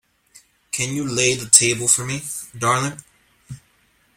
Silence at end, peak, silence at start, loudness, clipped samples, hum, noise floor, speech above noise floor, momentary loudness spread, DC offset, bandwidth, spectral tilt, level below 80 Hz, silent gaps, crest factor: 0.6 s; 0 dBFS; 0.75 s; -18 LUFS; under 0.1%; none; -60 dBFS; 41 dB; 15 LU; under 0.1%; 16.5 kHz; -2 dB/octave; -56 dBFS; none; 22 dB